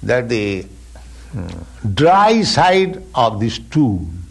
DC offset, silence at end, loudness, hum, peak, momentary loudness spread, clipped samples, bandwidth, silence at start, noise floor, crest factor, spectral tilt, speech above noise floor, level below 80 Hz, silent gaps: under 0.1%; 0 s; -15 LUFS; none; -2 dBFS; 17 LU; under 0.1%; 12 kHz; 0 s; -36 dBFS; 14 dB; -5.5 dB/octave; 21 dB; -38 dBFS; none